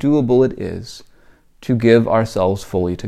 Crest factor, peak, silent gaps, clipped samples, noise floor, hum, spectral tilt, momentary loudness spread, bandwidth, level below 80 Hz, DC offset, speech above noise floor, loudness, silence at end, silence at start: 18 dB; 0 dBFS; none; under 0.1%; -49 dBFS; none; -7.5 dB/octave; 17 LU; 14 kHz; -44 dBFS; under 0.1%; 33 dB; -16 LUFS; 0 s; 0 s